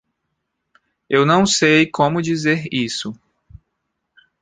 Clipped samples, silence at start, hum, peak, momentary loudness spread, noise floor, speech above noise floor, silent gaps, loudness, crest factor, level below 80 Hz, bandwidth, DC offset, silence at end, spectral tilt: under 0.1%; 1.1 s; none; -2 dBFS; 10 LU; -75 dBFS; 58 dB; none; -16 LUFS; 18 dB; -54 dBFS; 9.6 kHz; under 0.1%; 1.3 s; -4.5 dB/octave